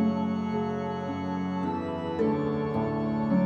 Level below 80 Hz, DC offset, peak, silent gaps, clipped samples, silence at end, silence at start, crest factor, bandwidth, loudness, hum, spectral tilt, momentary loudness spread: -56 dBFS; under 0.1%; -14 dBFS; none; under 0.1%; 0 s; 0 s; 12 dB; 7 kHz; -29 LUFS; none; -9 dB/octave; 5 LU